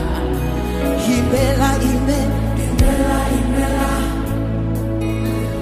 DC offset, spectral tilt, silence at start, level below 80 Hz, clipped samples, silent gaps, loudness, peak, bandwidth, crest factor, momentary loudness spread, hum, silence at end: under 0.1%; -6 dB/octave; 0 s; -22 dBFS; under 0.1%; none; -18 LUFS; -2 dBFS; 15.5 kHz; 16 dB; 5 LU; none; 0 s